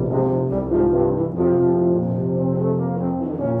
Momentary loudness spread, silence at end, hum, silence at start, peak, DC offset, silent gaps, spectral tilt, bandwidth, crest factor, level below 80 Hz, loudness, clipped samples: 5 LU; 0 s; none; 0 s; -8 dBFS; under 0.1%; none; -13.5 dB/octave; 2.4 kHz; 12 dB; -42 dBFS; -20 LUFS; under 0.1%